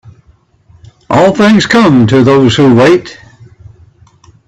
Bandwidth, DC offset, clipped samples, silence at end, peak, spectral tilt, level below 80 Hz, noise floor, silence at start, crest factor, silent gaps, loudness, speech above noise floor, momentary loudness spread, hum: 9.4 kHz; under 0.1%; under 0.1%; 1.35 s; 0 dBFS; -6.5 dB/octave; -42 dBFS; -47 dBFS; 1.1 s; 10 dB; none; -7 LUFS; 41 dB; 6 LU; none